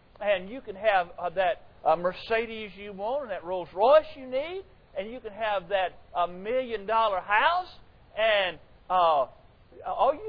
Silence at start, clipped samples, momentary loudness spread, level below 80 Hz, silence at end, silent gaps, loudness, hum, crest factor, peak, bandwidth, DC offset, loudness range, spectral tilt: 0.2 s; under 0.1%; 15 LU; -56 dBFS; 0 s; none; -27 LUFS; none; 18 dB; -8 dBFS; 5.2 kHz; under 0.1%; 3 LU; -6.5 dB/octave